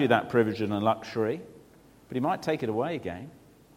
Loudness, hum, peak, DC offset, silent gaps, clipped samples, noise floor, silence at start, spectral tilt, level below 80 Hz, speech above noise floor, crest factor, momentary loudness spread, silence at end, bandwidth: -29 LUFS; none; -6 dBFS; under 0.1%; none; under 0.1%; -56 dBFS; 0 s; -7 dB/octave; -64 dBFS; 28 dB; 22 dB; 14 LU; 0.4 s; 16.5 kHz